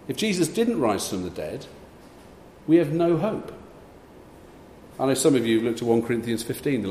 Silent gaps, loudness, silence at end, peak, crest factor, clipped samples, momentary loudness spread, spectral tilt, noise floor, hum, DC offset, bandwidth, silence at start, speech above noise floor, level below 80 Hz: none; -24 LUFS; 0 s; -8 dBFS; 18 dB; under 0.1%; 18 LU; -5 dB/octave; -47 dBFS; none; under 0.1%; 15 kHz; 0.05 s; 24 dB; -56 dBFS